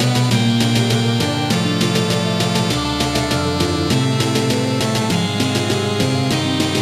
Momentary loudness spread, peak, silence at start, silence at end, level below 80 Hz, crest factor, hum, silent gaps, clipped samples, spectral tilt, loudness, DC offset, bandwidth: 3 LU; -2 dBFS; 0 s; 0 s; -40 dBFS; 16 dB; none; none; under 0.1%; -5 dB/octave; -17 LUFS; under 0.1%; 15.5 kHz